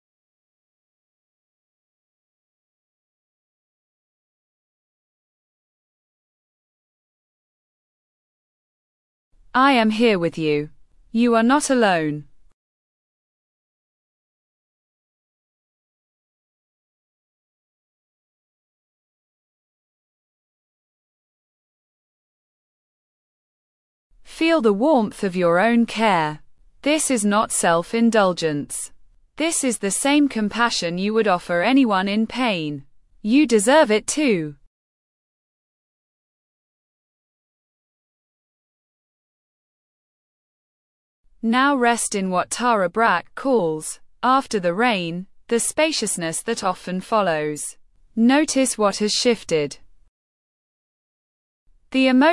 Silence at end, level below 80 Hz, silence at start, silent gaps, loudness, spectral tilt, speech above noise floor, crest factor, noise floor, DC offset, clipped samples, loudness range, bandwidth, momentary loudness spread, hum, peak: 0 s; -58 dBFS; 9.55 s; 12.53-24.10 s, 34.67-41.24 s, 50.08-51.66 s; -19 LUFS; -4 dB/octave; over 71 dB; 18 dB; under -90 dBFS; under 0.1%; under 0.1%; 5 LU; 12 kHz; 10 LU; none; -4 dBFS